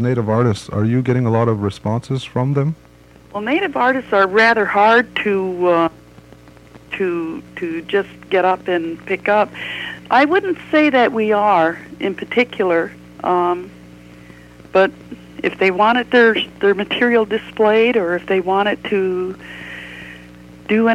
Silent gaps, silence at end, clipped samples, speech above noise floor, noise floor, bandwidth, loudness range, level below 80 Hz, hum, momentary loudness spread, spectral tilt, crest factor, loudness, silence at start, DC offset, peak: none; 0 s; under 0.1%; 27 dB; -43 dBFS; 12 kHz; 5 LU; -52 dBFS; 60 Hz at -45 dBFS; 14 LU; -7 dB/octave; 14 dB; -17 LUFS; 0 s; under 0.1%; -2 dBFS